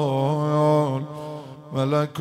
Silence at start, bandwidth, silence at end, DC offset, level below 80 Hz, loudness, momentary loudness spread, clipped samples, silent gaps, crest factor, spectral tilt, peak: 0 s; 12.5 kHz; 0 s; under 0.1%; -66 dBFS; -23 LUFS; 15 LU; under 0.1%; none; 14 dB; -8 dB/octave; -10 dBFS